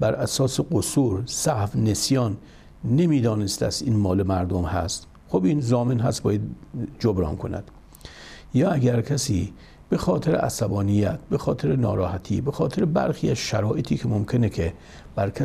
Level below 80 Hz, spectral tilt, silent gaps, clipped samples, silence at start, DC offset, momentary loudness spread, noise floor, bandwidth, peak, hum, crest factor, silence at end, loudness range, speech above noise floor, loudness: -44 dBFS; -6 dB/octave; none; under 0.1%; 0 s; under 0.1%; 10 LU; -44 dBFS; 15.5 kHz; -8 dBFS; none; 14 dB; 0 s; 3 LU; 21 dB; -24 LUFS